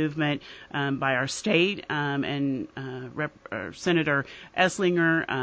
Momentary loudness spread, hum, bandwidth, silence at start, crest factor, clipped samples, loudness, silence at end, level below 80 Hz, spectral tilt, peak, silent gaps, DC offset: 12 LU; none; 8 kHz; 0 s; 18 dB; under 0.1%; -26 LUFS; 0 s; -62 dBFS; -5 dB/octave; -8 dBFS; none; under 0.1%